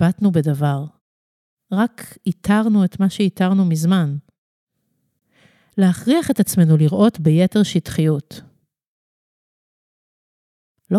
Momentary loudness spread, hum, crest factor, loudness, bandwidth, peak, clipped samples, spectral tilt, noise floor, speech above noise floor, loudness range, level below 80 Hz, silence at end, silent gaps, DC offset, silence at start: 11 LU; none; 14 dB; -18 LUFS; 14.5 kHz; -4 dBFS; under 0.1%; -7 dB/octave; -70 dBFS; 54 dB; 5 LU; -54 dBFS; 0 s; 1.01-1.57 s, 4.38-4.67 s, 8.87-10.75 s; under 0.1%; 0 s